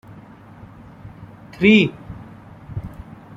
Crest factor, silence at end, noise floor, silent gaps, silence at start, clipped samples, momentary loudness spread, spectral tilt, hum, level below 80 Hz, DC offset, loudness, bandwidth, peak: 20 dB; 0.5 s; -42 dBFS; none; 1.05 s; under 0.1%; 28 LU; -7 dB/octave; none; -48 dBFS; under 0.1%; -16 LUFS; 7.4 kHz; -2 dBFS